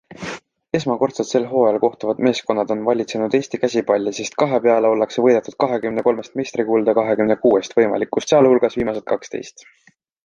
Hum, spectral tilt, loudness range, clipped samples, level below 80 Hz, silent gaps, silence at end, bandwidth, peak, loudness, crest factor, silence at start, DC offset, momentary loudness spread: none; -5.5 dB/octave; 2 LU; under 0.1%; -56 dBFS; none; 0.75 s; 9.4 kHz; -2 dBFS; -18 LUFS; 16 dB; 0.1 s; under 0.1%; 9 LU